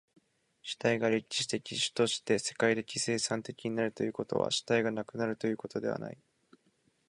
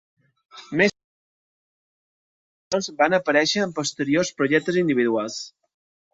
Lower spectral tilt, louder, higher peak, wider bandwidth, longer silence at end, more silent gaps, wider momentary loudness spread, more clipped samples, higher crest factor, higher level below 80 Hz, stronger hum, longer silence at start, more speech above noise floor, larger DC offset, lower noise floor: about the same, -3.5 dB/octave vs -4 dB/octave; second, -32 LUFS vs -22 LUFS; second, -12 dBFS vs -4 dBFS; first, 11.5 kHz vs 8 kHz; first, 0.95 s vs 0.65 s; second, none vs 1.04-2.71 s; about the same, 7 LU vs 9 LU; neither; about the same, 20 dB vs 20 dB; second, -72 dBFS vs -66 dBFS; neither; about the same, 0.65 s vs 0.55 s; second, 40 dB vs over 69 dB; neither; second, -72 dBFS vs under -90 dBFS